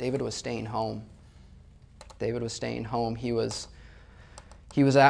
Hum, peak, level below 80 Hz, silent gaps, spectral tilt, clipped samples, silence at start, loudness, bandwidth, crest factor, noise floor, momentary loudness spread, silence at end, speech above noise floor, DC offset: none; -6 dBFS; -52 dBFS; none; -5.5 dB/octave; under 0.1%; 0 s; -31 LUFS; 10.5 kHz; 24 dB; -52 dBFS; 21 LU; 0 s; 26 dB; under 0.1%